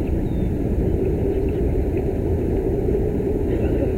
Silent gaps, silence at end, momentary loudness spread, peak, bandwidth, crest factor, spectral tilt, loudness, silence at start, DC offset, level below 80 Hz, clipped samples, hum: none; 0 s; 2 LU; -6 dBFS; 15.5 kHz; 14 dB; -10 dB/octave; -22 LUFS; 0 s; under 0.1%; -26 dBFS; under 0.1%; none